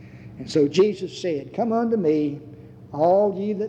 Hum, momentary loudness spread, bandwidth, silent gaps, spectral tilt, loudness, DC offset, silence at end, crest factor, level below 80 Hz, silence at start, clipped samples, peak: none; 17 LU; 9.4 kHz; none; -7 dB/octave; -22 LUFS; under 0.1%; 0 s; 16 dB; -60 dBFS; 0 s; under 0.1%; -8 dBFS